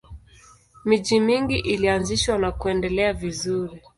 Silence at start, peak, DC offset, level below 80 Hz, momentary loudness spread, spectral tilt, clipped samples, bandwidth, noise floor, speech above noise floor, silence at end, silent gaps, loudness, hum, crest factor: 0.1 s; -6 dBFS; under 0.1%; -40 dBFS; 7 LU; -4.5 dB/octave; under 0.1%; 11.5 kHz; -52 dBFS; 30 dB; 0.2 s; none; -22 LUFS; none; 16 dB